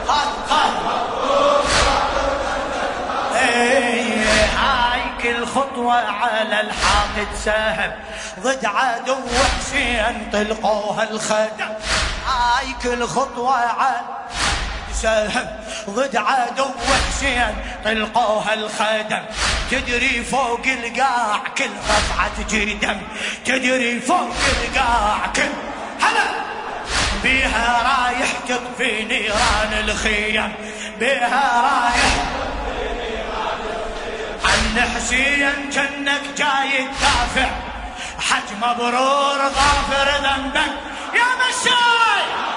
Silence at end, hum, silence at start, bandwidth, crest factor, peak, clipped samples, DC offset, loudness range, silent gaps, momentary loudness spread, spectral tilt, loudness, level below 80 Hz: 0 s; none; 0 s; 11 kHz; 18 dB; -2 dBFS; under 0.1%; under 0.1%; 3 LU; none; 8 LU; -2.5 dB/octave; -18 LUFS; -34 dBFS